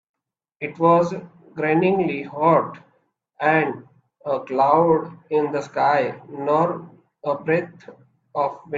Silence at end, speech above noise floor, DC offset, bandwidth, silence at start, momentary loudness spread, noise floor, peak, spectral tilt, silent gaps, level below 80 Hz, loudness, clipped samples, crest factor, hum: 0 s; 46 dB; under 0.1%; 7.6 kHz; 0.6 s; 15 LU; -66 dBFS; -2 dBFS; -8 dB/octave; none; -66 dBFS; -21 LUFS; under 0.1%; 20 dB; none